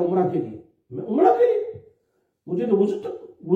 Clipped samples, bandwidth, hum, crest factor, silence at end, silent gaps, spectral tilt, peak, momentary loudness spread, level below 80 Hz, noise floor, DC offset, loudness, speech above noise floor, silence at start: under 0.1%; 7.4 kHz; none; 18 dB; 0 s; none; -9.5 dB/octave; -4 dBFS; 19 LU; -70 dBFS; -70 dBFS; under 0.1%; -22 LUFS; 50 dB; 0 s